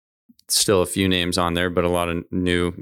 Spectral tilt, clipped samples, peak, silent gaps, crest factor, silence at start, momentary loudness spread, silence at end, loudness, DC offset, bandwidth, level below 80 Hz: -3.5 dB/octave; under 0.1%; -6 dBFS; none; 16 dB; 0.5 s; 6 LU; 0 s; -20 LUFS; under 0.1%; 18.5 kHz; -44 dBFS